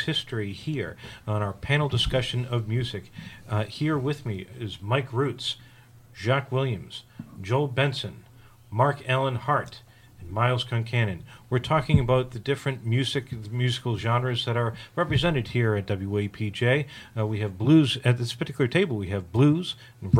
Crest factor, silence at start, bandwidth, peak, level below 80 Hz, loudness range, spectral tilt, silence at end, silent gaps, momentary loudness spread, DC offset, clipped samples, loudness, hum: 20 dB; 0 s; 13.5 kHz; -6 dBFS; -48 dBFS; 5 LU; -6.5 dB/octave; 0 s; none; 12 LU; under 0.1%; under 0.1%; -26 LUFS; none